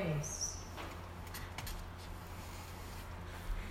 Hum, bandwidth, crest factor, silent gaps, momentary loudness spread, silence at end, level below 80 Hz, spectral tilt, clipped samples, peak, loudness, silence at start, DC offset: none; 16 kHz; 18 dB; none; 9 LU; 0 s; -48 dBFS; -4 dB/octave; under 0.1%; -26 dBFS; -44 LUFS; 0 s; under 0.1%